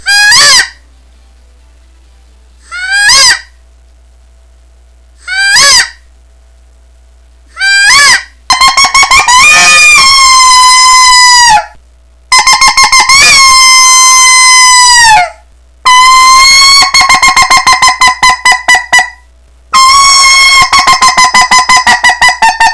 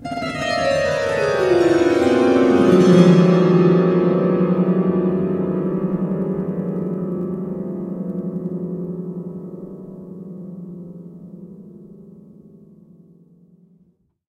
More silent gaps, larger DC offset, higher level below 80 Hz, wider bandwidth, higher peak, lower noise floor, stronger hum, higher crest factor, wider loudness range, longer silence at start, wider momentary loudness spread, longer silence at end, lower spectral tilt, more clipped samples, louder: neither; neither; first, -32 dBFS vs -54 dBFS; about the same, 11 kHz vs 10.5 kHz; about the same, 0 dBFS vs 0 dBFS; second, -39 dBFS vs -60 dBFS; neither; second, 4 dB vs 18 dB; second, 9 LU vs 22 LU; about the same, 0.05 s vs 0 s; second, 7 LU vs 22 LU; second, 0 s vs 2.2 s; second, 2 dB/octave vs -7.5 dB/octave; first, 10% vs under 0.1%; first, -1 LUFS vs -18 LUFS